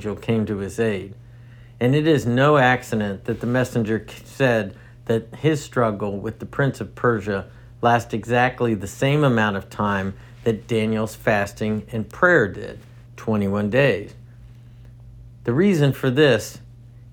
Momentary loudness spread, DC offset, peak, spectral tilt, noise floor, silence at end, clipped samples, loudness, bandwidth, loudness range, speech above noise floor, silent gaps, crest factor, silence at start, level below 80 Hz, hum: 13 LU; under 0.1%; -2 dBFS; -6.5 dB/octave; -43 dBFS; 0.05 s; under 0.1%; -21 LUFS; 18.5 kHz; 3 LU; 23 dB; none; 18 dB; 0 s; -48 dBFS; none